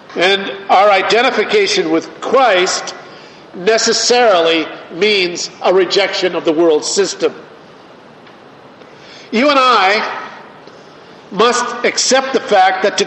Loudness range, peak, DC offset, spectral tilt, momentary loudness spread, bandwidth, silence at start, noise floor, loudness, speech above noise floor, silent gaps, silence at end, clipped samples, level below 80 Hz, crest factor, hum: 4 LU; 0 dBFS; under 0.1%; -2 dB/octave; 10 LU; 8.8 kHz; 0.1 s; -39 dBFS; -12 LUFS; 26 dB; none; 0 s; under 0.1%; -64 dBFS; 14 dB; none